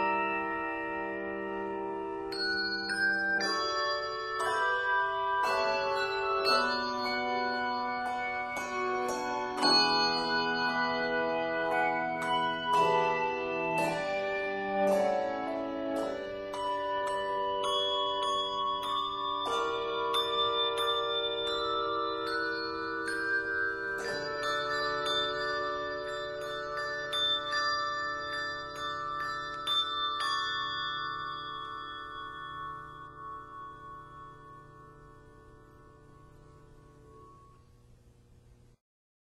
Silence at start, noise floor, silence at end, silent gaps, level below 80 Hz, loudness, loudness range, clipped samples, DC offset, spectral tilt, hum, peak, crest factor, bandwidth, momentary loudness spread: 0 s; -59 dBFS; 0.75 s; none; -62 dBFS; -31 LUFS; 7 LU; under 0.1%; under 0.1%; -3 dB/octave; none; -14 dBFS; 18 dB; 14 kHz; 10 LU